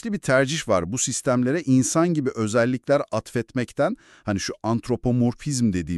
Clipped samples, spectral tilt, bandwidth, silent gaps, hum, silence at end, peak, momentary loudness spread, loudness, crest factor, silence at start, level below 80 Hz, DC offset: under 0.1%; -5 dB/octave; 12.5 kHz; none; none; 0 s; -6 dBFS; 7 LU; -23 LUFS; 16 dB; 0.05 s; -50 dBFS; under 0.1%